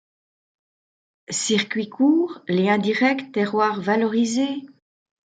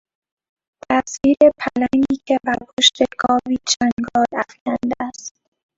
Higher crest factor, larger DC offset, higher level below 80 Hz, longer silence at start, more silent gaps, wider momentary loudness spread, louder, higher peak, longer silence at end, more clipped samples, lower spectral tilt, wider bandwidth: about the same, 18 dB vs 20 dB; neither; second, -72 dBFS vs -52 dBFS; first, 1.3 s vs 0.9 s; second, none vs 2.73-2.77 s, 3.92-3.97 s, 4.61-4.66 s; second, 7 LU vs 10 LU; second, -21 LUFS vs -18 LUFS; second, -6 dBFS vs 0 dBFS; first, 0.65 s vs 0.5 s; neither; first, -4.5 dB/octave vs -2.5 dB/octave; first, 9.6 kHz vs 8 kHz